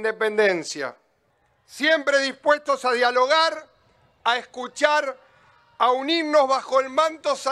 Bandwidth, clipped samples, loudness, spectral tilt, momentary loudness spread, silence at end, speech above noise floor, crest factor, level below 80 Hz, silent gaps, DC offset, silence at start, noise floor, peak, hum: 13 kHz; under 0.1%; -21 LUFS; -2 dB/octave; 9 LU; 0 s; 44 dB; 20 dB; -74 dBFS; none; under 0.1%; 0 s; -66 dBFS; -2 dBFS; none